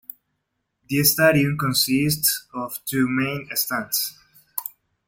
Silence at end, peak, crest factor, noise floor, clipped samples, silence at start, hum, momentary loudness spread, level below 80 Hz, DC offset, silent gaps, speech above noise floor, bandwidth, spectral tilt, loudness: 0.4 s; -4 dBFS; 20 dB; -76 dBFS; under 0.1%; 0.9 s; none; 14 LU; -58 dBFS; under 0.1%; none; 55 dB; 17 kHz; -3.5 dB/octave; -21 LUFS